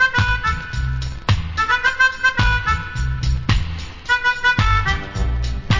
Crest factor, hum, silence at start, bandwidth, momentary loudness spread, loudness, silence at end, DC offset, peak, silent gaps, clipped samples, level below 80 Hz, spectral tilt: 16 dB; none; 0 s; 7.6 kHz; 9 LU; -19 LUFS; 0 s; under 0.1%; -2 dBFS; none; under 0.1%; -24 dBFS; -4.5 dB/octave